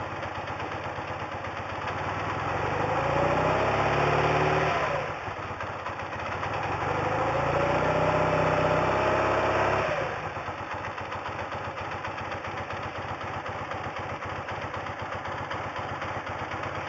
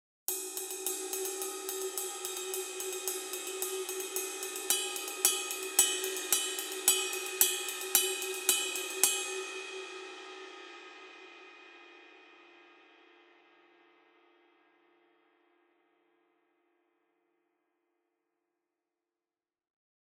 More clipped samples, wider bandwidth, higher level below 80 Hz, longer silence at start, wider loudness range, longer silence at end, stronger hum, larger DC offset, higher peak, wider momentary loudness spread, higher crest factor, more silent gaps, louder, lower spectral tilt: neither; second, 8 kHz vs 17.5 kHz; first, -48 dBFS vs under -90 dBFS; second, 0 s vs 0.3 s; second, 9 LU vs 18 LU; second, 0 s vs 7.3 s; neither; neither; second, -12 dBFS vs -4 dBFS; second, 10 LU vs 21 LU; second, 18 dB vs 32 dB; neither; about the same, -29 LUFS vs -31 LUFS; first, -6 dB/octave vs 2.5 dB/octave